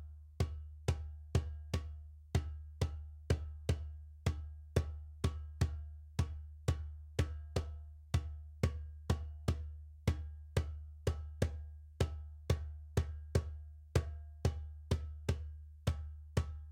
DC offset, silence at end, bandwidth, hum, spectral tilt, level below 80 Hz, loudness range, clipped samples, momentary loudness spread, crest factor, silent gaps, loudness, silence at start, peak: under 0.1%; 0 s; 16 kHz; none; -6.5 dB/octave; -44 dBFS; 1 LU; under 0.1%; 9 LU; 22 dB; none; -41 LUFS; 0 s; -18 dBFS